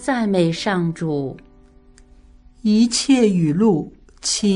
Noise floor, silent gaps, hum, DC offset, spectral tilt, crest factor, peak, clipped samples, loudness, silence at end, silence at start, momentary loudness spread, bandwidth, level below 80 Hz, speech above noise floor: -49 dBFS; none; none; under 0.1%; -5 dB/octave; 16 dB; -4 dBFS; under 0.1%; -19 LUFS; 0 s; 0 s; 10 LU; 11 kHz; -50 dBFS; 31 dB